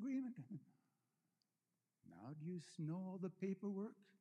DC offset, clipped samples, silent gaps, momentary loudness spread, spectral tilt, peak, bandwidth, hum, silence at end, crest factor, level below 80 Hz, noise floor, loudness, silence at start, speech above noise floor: under 0.1%; under 0.1%; none; 12 LU; -8 dB/octave; -34 dBFS; 10.5 kHz; none; 0.2 s; 16 dB; under -90 dBFS; under -90 dBFS; -49 LUFS; 0 s; over 42 dB